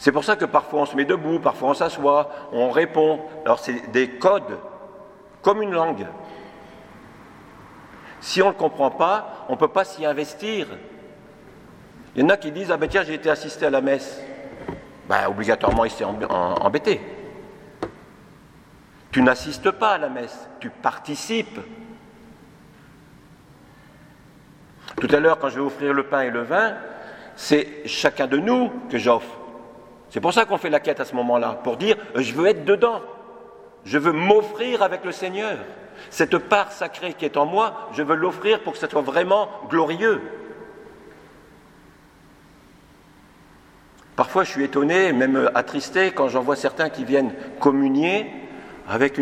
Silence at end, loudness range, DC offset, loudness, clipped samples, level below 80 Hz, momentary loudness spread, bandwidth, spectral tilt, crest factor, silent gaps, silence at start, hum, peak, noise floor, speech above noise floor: 0 s; 6 LU; under 0.1%; -21 LUFS; under 0.1%; -52 dBFS; 18 LU; 15 kHz; -5 dB/octave; 22 dB; none; 0 s; none; 0 dBFS; -51 dBFS; 30 dB